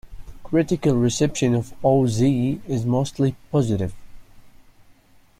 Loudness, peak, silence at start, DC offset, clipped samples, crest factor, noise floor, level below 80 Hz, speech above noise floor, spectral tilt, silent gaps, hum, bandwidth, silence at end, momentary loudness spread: -21 LUFS; -6 dBFS; 0.05 s; under 0.1%; under 0.1%; 16 dB; -53 dBFS; -46 dBFS; 32 dB; -6.5 dB/octave; none; none; 14.5 kHz; 0.9 s; 5 LU